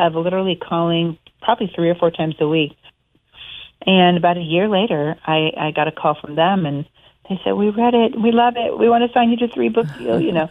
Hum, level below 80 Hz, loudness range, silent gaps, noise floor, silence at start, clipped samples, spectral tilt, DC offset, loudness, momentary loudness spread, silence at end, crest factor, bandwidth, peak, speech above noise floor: none; -56 dBFS; 3 LU; none; -47 dBFS; 0 s; under 0.1%; -8.5 dB/octave; under 0.1%; -17 LUFS; 10 LU; 0 s; 16 dB; 4 kHz; -2 dBFS; 30 dB